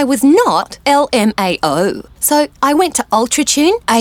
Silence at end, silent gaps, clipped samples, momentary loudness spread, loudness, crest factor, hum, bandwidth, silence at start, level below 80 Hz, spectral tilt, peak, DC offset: 0 s; none; under 0.1%; 5 LU; -13 LUFS; 12 dB; none; 18 kHz; 0 s; -46 dBFS; -3 dB/octave; 0 dBFS; under 0.1%